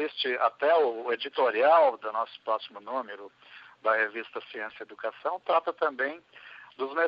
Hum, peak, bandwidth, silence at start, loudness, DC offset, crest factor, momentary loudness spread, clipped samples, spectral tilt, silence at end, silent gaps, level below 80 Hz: none; -10 dBFS; 5.4 kHz; 0 s; -28 LUFS; under 0.1%; 18 dB; 18 LU; under 0.1%; -5 dB/octave; 0 s; none; -86 dBFS